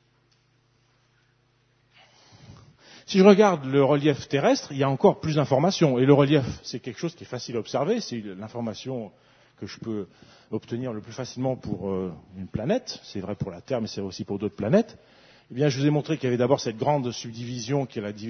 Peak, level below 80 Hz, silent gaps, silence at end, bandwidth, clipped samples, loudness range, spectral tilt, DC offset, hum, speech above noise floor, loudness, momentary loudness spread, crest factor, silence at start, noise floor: -2 dBFS; -60 dBFS; none; 0 s; 6.6 kHz; under 0.1%; 12 LU; -6.5 dB/octave; under 0.1%; none; 41 dB; -25 LUFS; 16 LU; 24 dB; 2.45 s; -65 dBFS